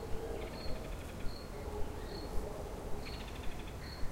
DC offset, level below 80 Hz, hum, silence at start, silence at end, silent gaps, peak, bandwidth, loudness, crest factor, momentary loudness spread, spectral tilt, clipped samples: under 0.1%; -44 dBFS; none; 0 s; 0 s; none; -22 dBFS; 16 kHz; -44 LUFS; 18 dB; 3 LU; -5.5 dB/octave; under 0.1%